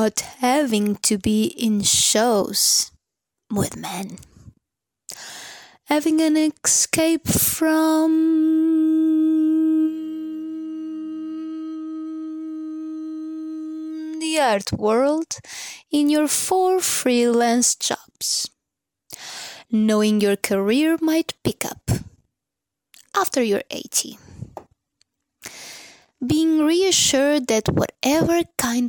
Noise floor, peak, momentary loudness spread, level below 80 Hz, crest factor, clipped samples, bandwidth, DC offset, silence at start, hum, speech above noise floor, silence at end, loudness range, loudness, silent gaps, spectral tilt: -84 dBFS; 0 dBFS; 16 LU; -52 dBFS; 22 dB; under 0.1%; 19 kHz; under 0.1%; 0 s; none; 65 dB; 0 s; 8 LU; -20 LUFS; none; -3.5 dB/octave